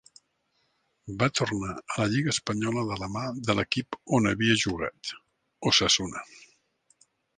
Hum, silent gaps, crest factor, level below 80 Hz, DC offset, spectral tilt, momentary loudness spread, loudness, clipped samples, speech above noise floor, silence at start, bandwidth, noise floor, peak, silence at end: none; none; 24 dB; -54 dBFS; under 0.1%; -4 dB/octave; 15 LU; -27 LUFS; under 0.1%; 46 dB; 1.05 s; 10.5 kHz; -73 dBFS; -6 dBFS; 1 s